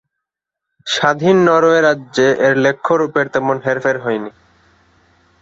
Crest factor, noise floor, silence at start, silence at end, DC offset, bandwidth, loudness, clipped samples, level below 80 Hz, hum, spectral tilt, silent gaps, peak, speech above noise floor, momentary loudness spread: 14 dB; -81 dBFS; 0.85 s; 1.1 s; under 0.1%; 8 kHz; -14 LUFS; under 0.1%; -58 dBFS; none; -5 dB/octave; none; -2 dBFS; 67 dB; 10 LU